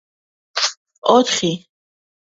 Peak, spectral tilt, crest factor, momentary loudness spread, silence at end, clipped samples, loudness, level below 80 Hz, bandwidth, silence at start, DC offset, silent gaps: 0 dBFS; -3 dB/octave; 20 dB; 12 LU; 0.8 s; under 0.1%; -18 LUFS; -64 dBFS; 8 kHz; 0.55 s; under 0.1%; 0.77-0.85 s, 0.98-1.02 s